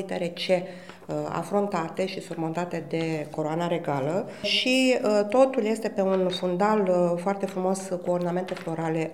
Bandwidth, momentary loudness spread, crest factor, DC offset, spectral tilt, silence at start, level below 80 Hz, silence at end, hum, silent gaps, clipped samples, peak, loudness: 14 kHz; 9 LU; 20 dB; 0.2%; -5.5 dB/octave; 0 s; -70 dBFS; 0 s; none; none; under 0.1%; -6 dBFS; -26 LUFS